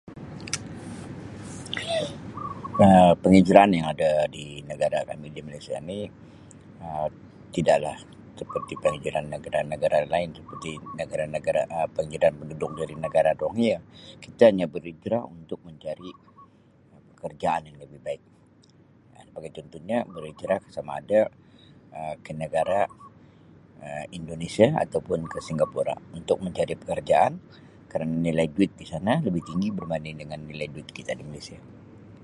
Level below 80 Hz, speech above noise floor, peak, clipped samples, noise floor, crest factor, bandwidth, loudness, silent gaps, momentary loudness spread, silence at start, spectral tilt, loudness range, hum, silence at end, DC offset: -54 dBFS; 31 dB; 0 dBFS; under 0.1%; -56 dBFS; 26 dB; 11.5 kHz; -25 LUFS; none; 19 LU; 0.05 s; -6.5 dB/octave; 13 LU; none; 0 s; under 0.1%